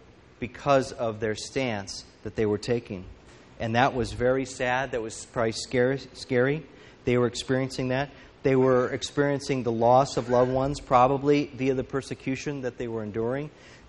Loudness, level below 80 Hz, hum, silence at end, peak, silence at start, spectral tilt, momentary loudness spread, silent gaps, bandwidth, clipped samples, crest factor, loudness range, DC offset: -26 LUFS; -50 dBFS; none; 0.1 s; -6 dBFS; 0.4 s; -5.5 dB/octave; 12 LU; none; 11 kHz; under 0.1%; 22 dB; 5 LU; under 0.1%